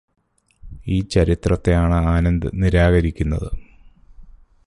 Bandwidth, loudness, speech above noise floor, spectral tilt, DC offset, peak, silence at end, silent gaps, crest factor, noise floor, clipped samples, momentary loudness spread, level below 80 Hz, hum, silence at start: 11 kHz; -19 LUFS; 29 dB; -7.5 dB/octave; under 0.1%; -2 dBFS; 0.45 s; none; 16 dB; -47 dBFS; under 0.1%; 11 LU; -26 dBFS; none; 0.65 s